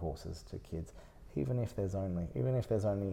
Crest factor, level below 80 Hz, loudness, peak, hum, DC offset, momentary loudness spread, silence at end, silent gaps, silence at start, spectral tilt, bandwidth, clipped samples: 14 dB; -52 dBFS; -37 LUFS; -22 dBFS; none; under 0.1%; 13 LU; 0 s; none; 0 s; -8.5 dB/octave; 14.5 kHz; under 0.1%